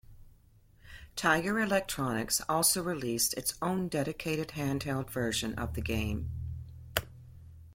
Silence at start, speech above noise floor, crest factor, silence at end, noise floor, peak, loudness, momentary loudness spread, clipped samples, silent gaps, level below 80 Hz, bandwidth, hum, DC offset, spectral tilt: 0.1 s; 29 dB; 26 dB; 0 s; -61 dBFS; -8 dBFS; -31 LUFS; 12 LU; under 0.1%; none; -50 dBFS; 16.5 kHz; none; under 0.1%; -3.5 dB/octave